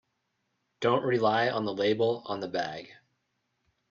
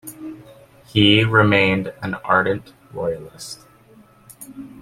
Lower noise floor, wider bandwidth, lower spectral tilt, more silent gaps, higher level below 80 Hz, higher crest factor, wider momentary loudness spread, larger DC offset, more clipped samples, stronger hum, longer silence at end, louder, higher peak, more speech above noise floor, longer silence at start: first, -79 dBFS vs -50 dBFS; second, 7.4 kHz vs 15.5 kHz; about the same, -6 dB/octave vs -5.5 dB/octave; neither; second, -72 dBFS vs -52 dBFS; about the same, 20 dB vs 20 dB; second, 8 LU vs 23 LU; neither; neither; neither; first, 1 s vs 0 s; second, -28 LUFS vs -18 LUFS; second, -12 dBFS vs 0 dBFS; first, 51 dB vs 31 dB; first, 0.8 s vs 0.05 s